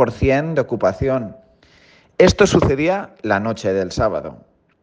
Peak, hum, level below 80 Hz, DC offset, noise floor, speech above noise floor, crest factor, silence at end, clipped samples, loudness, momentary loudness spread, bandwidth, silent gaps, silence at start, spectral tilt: 0 dBFS; none; -36 dBFS; under 0.1%; -51 dBFS; 34 dB; 18 dB; 0.5 s; under 0.1%; -18 LUFS; 11 LU; 9.8 kHz; none; 0 s; -6 dB/octave